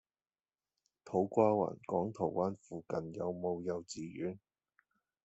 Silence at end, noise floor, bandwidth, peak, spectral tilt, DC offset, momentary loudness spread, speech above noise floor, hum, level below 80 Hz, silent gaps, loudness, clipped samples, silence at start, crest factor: 0.9 s; under -90 dBFS; 8.2 kHz; -14 dBFS; -7 dB/octave; under 0.1%; 12 LU; over 54 dB; none; -76 dBFS; none; -36 LUFS; under 0.1%; 1.05 s; 24 dB